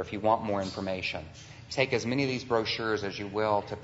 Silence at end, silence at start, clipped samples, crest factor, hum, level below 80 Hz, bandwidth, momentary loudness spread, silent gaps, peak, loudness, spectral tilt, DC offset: 0 s; 0 s; under 0.1%; 20 dB; none; -58 dBFS; 8 kHz; 8 LU; none; -10 dBFS; -30 LUFS; -5 dB/octave; under 0.1%